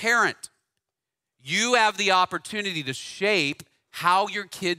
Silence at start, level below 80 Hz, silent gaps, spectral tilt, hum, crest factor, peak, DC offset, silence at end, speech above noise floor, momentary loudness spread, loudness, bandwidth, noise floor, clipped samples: 0 s; -72 dBFS; none; -2.5 dB/octave; none; 20 dB; -4 dBFS; under 0.1%; 0.05 s; 63 dB; 19 LU; -23 LUFS; 16 kHz; -87 dBFS; under 0.1%